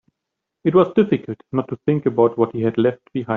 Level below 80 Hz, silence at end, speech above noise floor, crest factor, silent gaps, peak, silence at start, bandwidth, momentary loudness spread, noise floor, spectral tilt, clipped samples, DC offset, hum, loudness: -60 dBFS; 0 s; 63 dB; 16 dB; none; -2 dBFS; 0.65 s; 4.1 kHz; 9 LU; -81 dBFS; -7.5 dB/octave; under 0.1%; under 0.1%; none; -19 LUFS